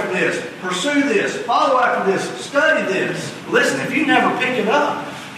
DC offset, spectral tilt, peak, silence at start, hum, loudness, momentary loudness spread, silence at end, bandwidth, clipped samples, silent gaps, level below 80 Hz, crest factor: under 0.1%; -4 dB/octave; -2 dBFS; 0 s; none; -18 LUFS; 7 LU; 0 s; 13.5 kHz; under 0.1%; none; -66 dBFS; 16 dB